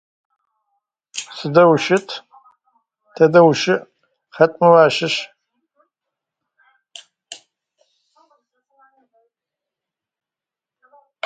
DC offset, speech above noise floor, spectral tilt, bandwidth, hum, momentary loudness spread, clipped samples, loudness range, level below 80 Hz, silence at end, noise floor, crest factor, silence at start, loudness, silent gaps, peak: under 0.1%; 75 dB; -5 dB/octave; 9.2 kHz; none; 25 LU; under 0.1%; 4 LU; -66 dBFS; 3.9 s; -88 dBFS; 20 dB; 1.15 s; -15 LUFS; none; 0 dBFS